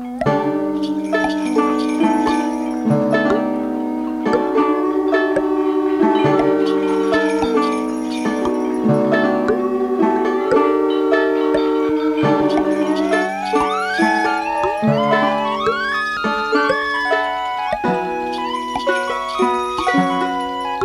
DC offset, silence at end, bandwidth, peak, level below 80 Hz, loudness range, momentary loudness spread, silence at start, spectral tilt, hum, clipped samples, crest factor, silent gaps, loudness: under 0.1%; 0 s; 12.5 kHz; -4 dBFS; -48 dBFS; 3 LU; 5 LU; 0 s; -6 dB/octave; none; under 0.1%; 12 dB; none; -18 LUFS